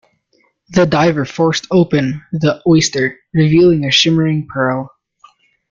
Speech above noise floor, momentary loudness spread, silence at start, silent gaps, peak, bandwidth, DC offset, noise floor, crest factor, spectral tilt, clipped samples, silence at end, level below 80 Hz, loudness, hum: 46 dB; 8 LU; 0.7 s; none; 0 dBFS; 7.6 kHz; under 0.1%; -59 dBFS; 14 dB; -5.5 dB/octave; under 0.1%; 0.85 s; -48 dBFS; -14 LUFS; none